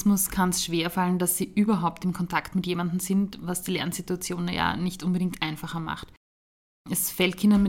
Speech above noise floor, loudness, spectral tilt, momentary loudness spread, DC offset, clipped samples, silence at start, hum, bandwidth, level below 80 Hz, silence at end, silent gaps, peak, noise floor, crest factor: over 64 dB; -26 LUFS; -4.5 dB/octave; 7 LU; under 0.1%; under 0.1%; 0 s; none; 17 kHz; -50 dBFS; 0 s; 6.17-6.85 s; -8 dBFS; under -90 dBFS; 18 dB